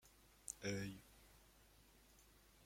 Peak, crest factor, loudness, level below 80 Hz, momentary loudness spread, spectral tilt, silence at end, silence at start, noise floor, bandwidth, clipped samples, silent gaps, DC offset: -28 dBFS; 26 dB; -49 LUFS; -72 dBFS; 22 LU; -4 dB/octave; 0 s; 0.05 s; -69 dBFS; 16.5 kHz; under 0.1%; none; under 0.1%